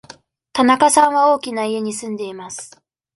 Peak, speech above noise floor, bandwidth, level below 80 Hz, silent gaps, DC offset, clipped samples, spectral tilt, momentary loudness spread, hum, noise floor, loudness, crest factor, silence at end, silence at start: 0 dBFS; 28 dB; 12 kHz; -62 dBFS; none; under 0.1%; under 0.1%; -3 dB/octave; 18 LU; none; -45 dBFS; -16 LUFS; 18 dB; 0.5 s; 0.55 s